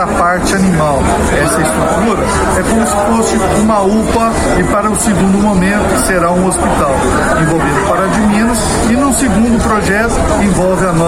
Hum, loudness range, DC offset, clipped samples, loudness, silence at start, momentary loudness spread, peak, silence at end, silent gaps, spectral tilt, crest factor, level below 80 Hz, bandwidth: none; 0 LU; under 0.1%; under 0.1%; -11 LUFS; 0 s; 1 LU; -2 dBFS; 0 s; none; -5 dB/octave; 8 dB; -22 dBFS; 16 kHz